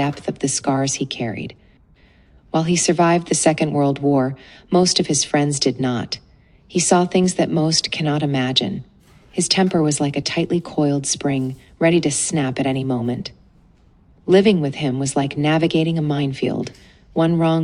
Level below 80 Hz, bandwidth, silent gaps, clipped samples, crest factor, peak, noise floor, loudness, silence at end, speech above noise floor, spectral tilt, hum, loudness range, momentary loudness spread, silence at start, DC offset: -52 dBFS; 11.5 kHz; none; under 0.1%; 18 dB; 0 dBFS; -52 dBFS; -19 LUFS; 0 s; 33 dB; -4.5 dB/octave; none; 3 LU; 10 LU; 0 s; under 0.1%